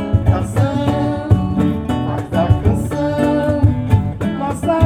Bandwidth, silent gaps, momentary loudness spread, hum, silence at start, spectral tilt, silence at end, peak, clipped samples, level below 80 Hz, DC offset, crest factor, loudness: 13 kHz; none; 5 LU; none; 0 s; -8 dB/octave; 0 s; 0 dBFS; under 0.1%; -28 dBFS; under 0.1%; 16 dB; -17 LUFS